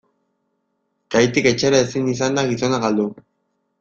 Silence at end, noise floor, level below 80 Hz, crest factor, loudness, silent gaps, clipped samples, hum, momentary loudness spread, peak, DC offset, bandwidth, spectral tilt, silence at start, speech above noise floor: 0.65 s; -71 dBFS; -54 dBFS; 18 dB; -18 LUFS; none; under 0.1%; none; 6 LU; -2 dBFS; under 0.1%; 7.8 kHz; -4.5 dB/octave; 1.1 s; 53 dB